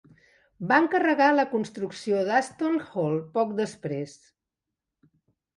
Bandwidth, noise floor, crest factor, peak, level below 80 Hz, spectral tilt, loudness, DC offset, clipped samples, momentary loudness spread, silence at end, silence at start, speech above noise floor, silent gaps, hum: 11.5 kHz; -87 dBFS; 20 dB; -8 dBFS; -72 dBFS; -6 dB/octave; -25 LUFS; under 0.1%; under 0.1%; 12 LU; 1.45 s; 0.6 s; 61 dB; none; none